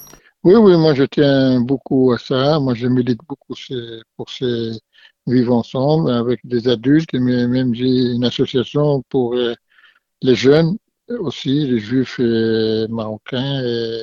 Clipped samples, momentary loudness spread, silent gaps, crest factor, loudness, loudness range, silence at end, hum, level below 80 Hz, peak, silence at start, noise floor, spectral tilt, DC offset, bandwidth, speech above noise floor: under 0.1%; 14 LU; none; 16 dB; -16 LUFS; 5 LU; 0 s; none; -50 dBFS; 0 dBFS; 0 s; -53 dBFS; -7.5 dB/octave; under 0.1%; 7.2 kHz; 37 dB